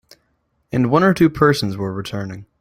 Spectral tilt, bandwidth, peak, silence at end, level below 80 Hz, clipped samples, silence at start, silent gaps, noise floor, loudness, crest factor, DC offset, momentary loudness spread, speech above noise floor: -6.5 dB/octave; 16 kHz; -2 dBFS; 0.15 s; -48 dBFS; under 0.1%; 0.75 s; none; -66 dBFS; -18 LUFS; 16 dB; under 0.1%; 13 LU; 49 dB